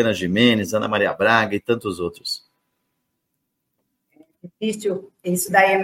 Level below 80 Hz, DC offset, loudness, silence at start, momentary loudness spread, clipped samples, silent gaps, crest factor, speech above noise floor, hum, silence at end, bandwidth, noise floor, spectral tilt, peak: -60 dBFS; under 0.1%; -20 LUFS; 0 s; 12 LU; under 0.1%; none; 20 dB; 56 dB; none; 0 s; 16.5 kHz; -76 dBFS; -4 dB/octave; -2 dBFS